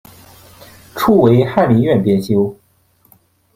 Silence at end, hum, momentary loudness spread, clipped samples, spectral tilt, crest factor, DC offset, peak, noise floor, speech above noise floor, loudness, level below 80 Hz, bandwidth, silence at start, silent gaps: 1.05 s; none; 9 LU; under 0.1%; -8 dB/octave; 16 dB; under 0.1%; 0 dBFS; -55 dBFS; 43 dB; -13 LUFS; -48 dBFS; 16 kHz; 0.95 s; none